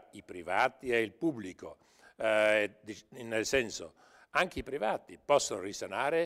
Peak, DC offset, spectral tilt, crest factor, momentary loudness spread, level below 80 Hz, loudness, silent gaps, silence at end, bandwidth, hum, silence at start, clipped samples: -14 dBFS; under 0.1%; -3 dB/octave; 20 dB; 18 LU; -62 dBFS; -32 LUFS; none; 0 s; 16 kHz; none; 0.15 s; under 0.1%